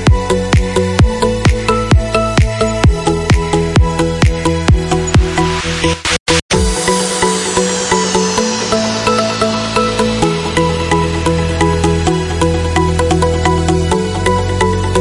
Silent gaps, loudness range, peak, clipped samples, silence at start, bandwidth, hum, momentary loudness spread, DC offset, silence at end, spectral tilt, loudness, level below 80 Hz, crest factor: 6.20-6.26 s, 6.42-6.49 s; 1 LU; 0 dBFS; under 0.1%; 0 s; 11.5 kHz; none; 2 LU; under 0.1%; 0 s; -5 dB/octave; -13 LUFS; -22 dBFS; 12 dB